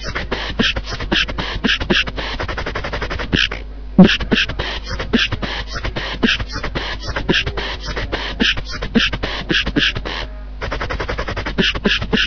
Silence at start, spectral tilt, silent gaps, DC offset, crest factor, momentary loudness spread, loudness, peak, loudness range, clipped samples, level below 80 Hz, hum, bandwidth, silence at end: 0 s; -3 dB/octave; none; under 0.1%; 18 dB; 9 LU; -18 LUFS; 0 dBFS; 3 LU; under 0.1%; -28 dBFS; none; 7 kHz; 0 s